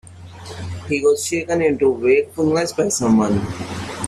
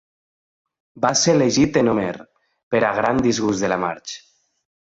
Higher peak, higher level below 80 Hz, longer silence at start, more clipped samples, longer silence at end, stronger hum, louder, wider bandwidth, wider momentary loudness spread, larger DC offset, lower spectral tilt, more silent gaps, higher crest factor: about the same, -4 dBFS vs -4 dBFS; about the same, -50 dBFS vs -50 dBFS; second, 0.05 s vs 0.95 s; neither; second, 0 s vs 0.7 s; neither; about the same, -18 LUFS vs -19 LUFS; first, 13.5 kHz vs 8.2 kHz; about the same, 14 LU vs 15 LU; neither; about the same, -5 dB/octave vs -4 dB/octave; second, none vs 2.63-2.71 s; about the same, 14 dB vs 18 dB